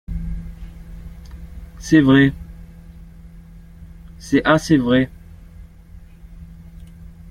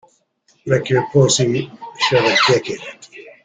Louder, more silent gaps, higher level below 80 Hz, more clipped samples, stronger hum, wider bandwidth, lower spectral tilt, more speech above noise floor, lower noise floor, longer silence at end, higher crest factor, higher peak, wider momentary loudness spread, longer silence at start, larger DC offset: about the same, -17 LUFS vs -16 LUFS; neither; first, -36 dBFS vs -54 dBFS; neither; neither; first, 13.5 kHz vs 9.6 kHz; first, -6.5 dB/octave vs -4 dB/octave; second, 27 dB vs 43 dB; second, -42 dBFS vs -60 dBFS; second, 0 s vs 0.15 s; about the same, 20 dB vs 16 dB; about the same, -2 dBFS vs -2 dBFS; first, 27 LU vs 19 LU; second, 0.1 s vs 0.65 s; neither